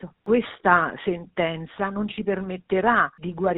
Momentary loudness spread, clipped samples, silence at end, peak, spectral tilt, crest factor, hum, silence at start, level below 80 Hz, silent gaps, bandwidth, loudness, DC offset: 9 LU; under 0.1%; 0 s; -2 dBFS; -4 dB/octave; 22 dB; none; 0 s; -54 dBFS; none; 4 kHz; -24 LUFS; under 0.1%